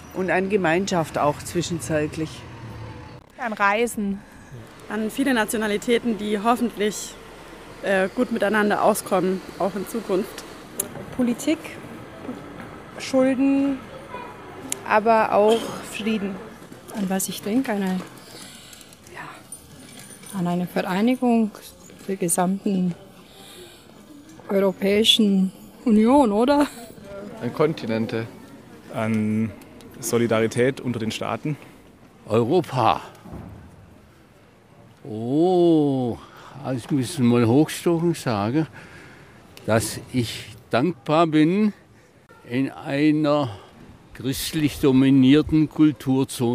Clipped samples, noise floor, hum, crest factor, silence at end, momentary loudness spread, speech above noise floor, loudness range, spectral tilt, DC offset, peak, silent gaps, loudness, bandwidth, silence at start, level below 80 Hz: under 0.1%; -52 dBFS; none; 20 dB; 0 s; 22 LU; 31 dB; 7 LU; -5 dB/octave; under 0.1%; -2 dBFS; none; -22 LUFS; 15.5 kHz; 0 s; -54 dBFS